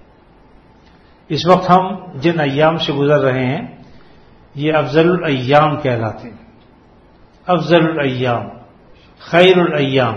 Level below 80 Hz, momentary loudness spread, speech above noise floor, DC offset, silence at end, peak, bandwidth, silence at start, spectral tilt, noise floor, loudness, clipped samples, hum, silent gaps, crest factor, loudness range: -50 dBFS; 13 LU; 33 dB; under 0.1%; 0 s; 0 dBFS; 7.8 kHz; 1.3 s; -7 dB/octave; -47 dBFS; -15 LUFS; under 0.1%; none; none; 16 dB; 3 LU